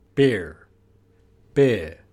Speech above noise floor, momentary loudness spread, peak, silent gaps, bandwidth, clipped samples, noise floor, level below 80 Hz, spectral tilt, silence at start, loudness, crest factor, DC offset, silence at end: 37 dB; 9 LU; -6 dBFS; none; 11 kHz; under 0.1%; -58 dBFS; -50 dBFS; -7 dB/octave; 0.15 s; -22 LUFS; 18 dB; under 0.1%; 0.2 s